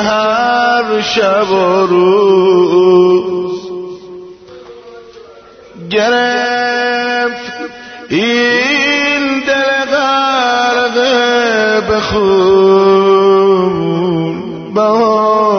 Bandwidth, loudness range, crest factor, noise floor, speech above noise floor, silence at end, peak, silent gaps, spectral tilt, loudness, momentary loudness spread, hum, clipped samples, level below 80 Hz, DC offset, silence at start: 6.6 kHz; 6 LU; 12 dB; -37 dBFS; 28 dB; 0 s; 0 dBFS; none; -5 dB/octave; -11 LUFS; 11 LU; none; under 0.1%; -46 dBFS; under 0.1%; 0 s